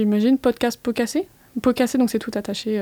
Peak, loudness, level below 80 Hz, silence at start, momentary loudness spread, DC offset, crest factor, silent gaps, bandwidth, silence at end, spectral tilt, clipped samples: -6 dBFS; -22 LUFS; -54 dBFS; 0 s; 8 LU; under 0.1%; 14 dB; none; over 20 kHz; 0 s; -5 dB/octave; under 0.1%